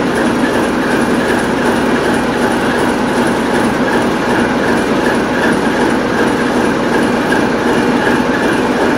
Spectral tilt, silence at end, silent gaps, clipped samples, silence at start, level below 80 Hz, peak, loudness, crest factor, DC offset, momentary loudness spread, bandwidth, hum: -5 dB/octave; 0 s; none; under 0.1%; 0 s; -36 dBFS; -2 dBFS; -13 LUFS; 12 dB; under 0.1%; 1 LU; 16.5 kHz; none